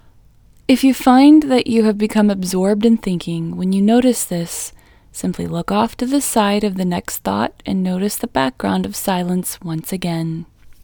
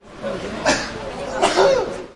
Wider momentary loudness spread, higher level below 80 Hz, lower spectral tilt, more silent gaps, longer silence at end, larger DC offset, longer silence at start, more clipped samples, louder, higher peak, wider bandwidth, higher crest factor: about the same, 12 LU vs 12 LU; about the same, -46 dBFS vs -44 dBFS; first, -5.5 dB/octave vs -3 dB/octave; neither; first, 0.15 s vs 0 s; neither; first, 0.7 s vs 0.05 s; neither; first, -17 LUFS vs -20 LUFS; about the same, 0 dBFS vs -2 dBFS; first, over 20 kHz vs 11.5 kHz; about the same, 16 dB vs 18 dB